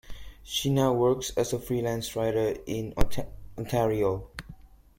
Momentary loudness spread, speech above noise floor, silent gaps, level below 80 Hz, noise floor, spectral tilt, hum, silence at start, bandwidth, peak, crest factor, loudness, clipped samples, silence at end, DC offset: 17 LU; 23 dB; none; -42 dBFS; -49 dBFS; -5.5 dB/octave; none; 0.05 s; 16.5 kHz; -8 dBFS; 20 dB; -28 LUFS; under 0.1%; 0.45 s; under 0.1%